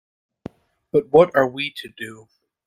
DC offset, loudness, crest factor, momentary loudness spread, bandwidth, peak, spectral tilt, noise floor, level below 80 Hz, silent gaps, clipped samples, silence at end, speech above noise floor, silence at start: under 0.1%; -19 LUFS; 20 dB; 25 LU; 15 kHz; -2 dBFS; -6 dB/octave; -41 dBFS; -60 dBFS; none; under 0.1%; 0.55 s; 22 dB; 0.95 s